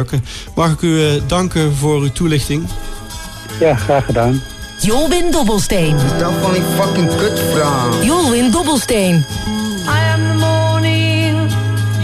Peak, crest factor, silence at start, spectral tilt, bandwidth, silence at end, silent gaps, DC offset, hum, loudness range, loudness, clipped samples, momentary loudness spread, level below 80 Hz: -2 dBFS; 12 dB; 0 s; -5 dB/octave; 14.5 kHz; 0 s; none; under 0.1%; none; 3 LU; -14 LUFS; under 0.1%; 7 LU; -30 dBFS